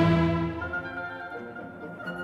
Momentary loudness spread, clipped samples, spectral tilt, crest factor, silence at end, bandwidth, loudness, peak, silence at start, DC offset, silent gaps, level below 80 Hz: 16 LU; under 0.1%; -8.5 dB/octave; 18 dB; 0 s; 6.4 kHz; -31 LUFS; -10 dBFS; 0 s; under 0.1%; none; -48 dBFS